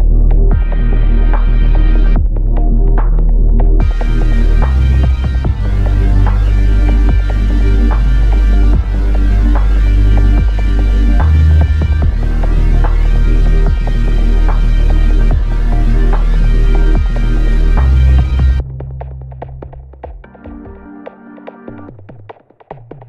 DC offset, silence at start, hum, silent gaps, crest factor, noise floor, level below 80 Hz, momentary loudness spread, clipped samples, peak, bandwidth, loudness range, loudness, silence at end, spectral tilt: 4%; 0 s; none; none; 10 dB; -37 dBFS; -10 dBFS; 20 LU; under 0.1%; 0 dBFS; 5 kHz; 6 LU; -13 LUFS; 0 s; -8.5 dB/octave